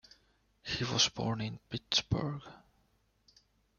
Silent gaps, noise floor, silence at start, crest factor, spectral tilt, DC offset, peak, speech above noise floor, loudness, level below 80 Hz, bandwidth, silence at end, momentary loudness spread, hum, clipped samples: none; -73 dBFS; 0.65 s; 24 dB; -3.5 dB/octave; under 0.1%; -14 dBFS; 39 dB; -33 LUFS; -60 dBFS; 7.2 kHz; 1.2 s; 17 LU; none; under 0.1%